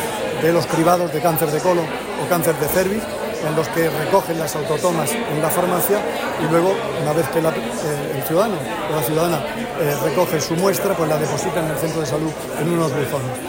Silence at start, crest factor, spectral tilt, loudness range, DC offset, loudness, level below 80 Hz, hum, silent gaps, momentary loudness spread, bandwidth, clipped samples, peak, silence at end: 0 s; 16 dB; -5 dB/octave; 1 LU; under 0.1%; -19 LUFS; -48 dBFS; none; none; 6 LU; 16.5 kHz; under 0.1%; -4 dBFS; 0 s